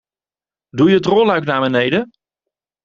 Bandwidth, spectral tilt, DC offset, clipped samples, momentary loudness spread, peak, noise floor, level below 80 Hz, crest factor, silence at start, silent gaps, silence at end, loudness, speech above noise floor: 7.4 kHz; -7 dB/octave; under 0.1%; under 0.1%; 12 LU; -2 dBFS; under -90 dBFS; -56 dBFS; 16 dB; 0.75 s; none; 0.8 s; -15 LUFS; over 76 dB